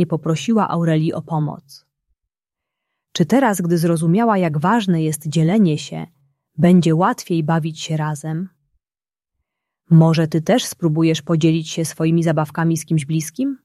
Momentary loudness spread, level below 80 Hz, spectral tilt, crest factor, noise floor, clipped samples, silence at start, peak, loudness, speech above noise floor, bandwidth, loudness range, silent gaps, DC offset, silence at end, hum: 11 LU; -60 dBFS; -6.5 dB/octave; 16 dB; under -90 dBFS; under 0.1%; 0 s; -2 dBFS; -18 LUFS; over 73 dB; 13 kHz; 4 LU; none; under 0.1%; 0.1 s; none